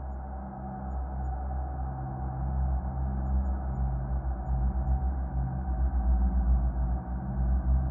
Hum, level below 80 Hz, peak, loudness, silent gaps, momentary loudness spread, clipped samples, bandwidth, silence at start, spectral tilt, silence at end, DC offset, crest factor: none; -30 dBFS; -16 dBFS; -32 LUFS; none; 8 LU; under 0.1%; 1.8 kHz; 0 s; -13.5 dB/octave; 0 s; under 0.1%; 12 dB